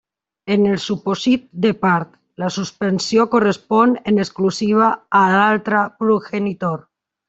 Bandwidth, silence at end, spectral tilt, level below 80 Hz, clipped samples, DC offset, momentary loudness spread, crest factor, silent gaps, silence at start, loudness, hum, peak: 8 kHz; 0.5 s; -5.5 dB/octave; -58 dBFS; under 0.1%; under 0.1%; 9 LU; 16 dB; none; 0.45 s; -17 LUFS; none; -2 dBFS